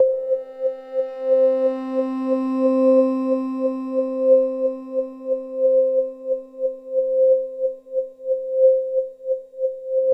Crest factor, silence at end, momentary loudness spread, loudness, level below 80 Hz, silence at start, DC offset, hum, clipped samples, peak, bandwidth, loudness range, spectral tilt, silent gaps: 14 dB; 0 s; 10 LU; -21 LUFS; -72 dBFS; 0 s; under 0.1%; none; under 0.1%; -6 dBFS; 5.2 kHz; 2 LU; -7.5 dB/octave; none